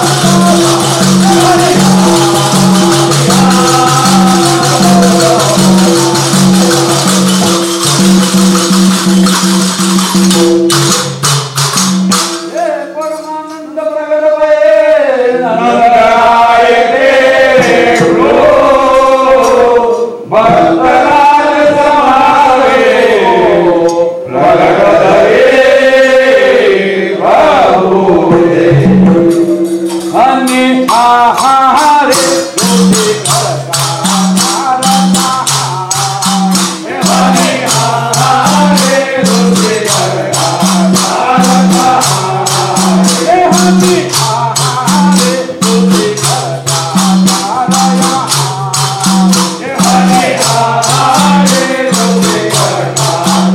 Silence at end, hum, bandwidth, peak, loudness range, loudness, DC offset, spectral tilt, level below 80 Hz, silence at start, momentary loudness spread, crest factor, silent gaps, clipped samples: 0 s; none; 16.5 kHz; 0 dBFS; 3 LU; -7 LUFS; under 0.1%; -4 dB/octave; -40 dBFS; 0 s; 5 LU; 8 dB; none; under 0.1%